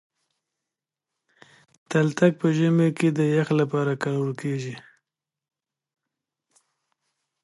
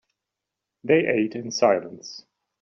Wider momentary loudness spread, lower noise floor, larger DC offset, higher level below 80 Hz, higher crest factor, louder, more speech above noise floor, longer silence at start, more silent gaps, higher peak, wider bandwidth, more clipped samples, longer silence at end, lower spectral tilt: second, 9 LU vs 19 LU; about the same, -87 dBFS vs -85 dBFS; neither; second, -74 dBFS vs -68 dBFS; about the same, 22 dB vs 20 dB; about the same, -23 LUFS vs -22 LUFS; about the same, 65 dB vs 63 dB; first, 1.9 s vs 0.85 s; neither; about the same, -4 dBFS vs -6 dBFS; first, 11.5 kHz vs 7.2 kHz; neither; first, 2.65 s vs 0.4 s; first, -7.5 dB/octave vs -4 dB/octave